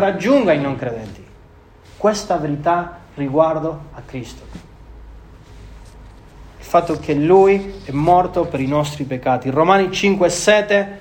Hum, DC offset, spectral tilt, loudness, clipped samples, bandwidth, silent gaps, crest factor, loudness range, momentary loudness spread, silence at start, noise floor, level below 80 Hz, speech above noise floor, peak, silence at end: none; under 0.1%; -5.5 dB/octave; -17 LUFS; under 0.1%; 16.5 kHz; none; 18 dB; 9 LU; 18 LU; 0 s; -45 dBFS; -42 dBFS; 28 dB; 0 dBFS; 0 s